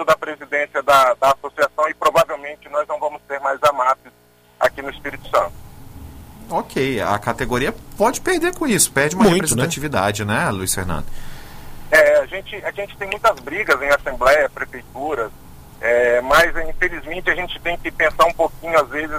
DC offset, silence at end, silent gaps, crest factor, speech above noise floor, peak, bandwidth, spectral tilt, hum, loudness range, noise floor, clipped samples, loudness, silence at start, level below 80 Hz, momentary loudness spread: under 0.1%; 0 s; none; 18 dB; 34 dB; -2 dBFS; 16 kHz; -3.5 dB/octave; 60 Hz at -55 dBFS; 4 LU; -52 dBFS; under 0.1%; -18 LUFS; 0 s; -38 dBFS; 13 LU